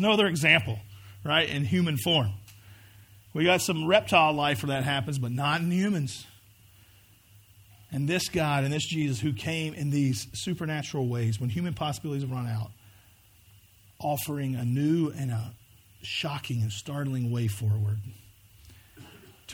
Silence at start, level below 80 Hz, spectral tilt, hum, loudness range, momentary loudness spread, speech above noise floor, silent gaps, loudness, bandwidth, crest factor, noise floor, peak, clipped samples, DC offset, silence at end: 0 s; -60 dBFS; -5 dB/octave; none; 7 LU; 13 LU; 31 dB; none; -27 LUFS; over 20 kHz; 24 dB; -58 dBFS; -6 dBFS; under 0.1%; under 0.1%; 0 s